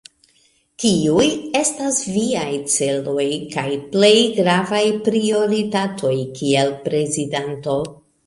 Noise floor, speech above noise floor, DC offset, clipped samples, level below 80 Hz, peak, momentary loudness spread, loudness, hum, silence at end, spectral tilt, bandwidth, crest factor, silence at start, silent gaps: -59 dBFS; 41 dB; under 0.1%; under 0.1%; -56 dBFS; -2 dBFS; 8 LU; -18 LUFS; none; 0.3 s; -4 dB/octave; 11.5 kHz; 18 dB; 0.8 s; none